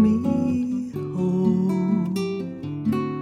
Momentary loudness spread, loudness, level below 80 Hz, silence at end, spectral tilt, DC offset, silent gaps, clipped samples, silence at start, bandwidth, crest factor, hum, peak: 8 LU; -24 LUFS; -56 dBFS; 0 s; -8.5 dB/octave; under 0.1%; none; under 0.1%; 0 s; 12.5 kHz; 14 dB; none; -8 dBFS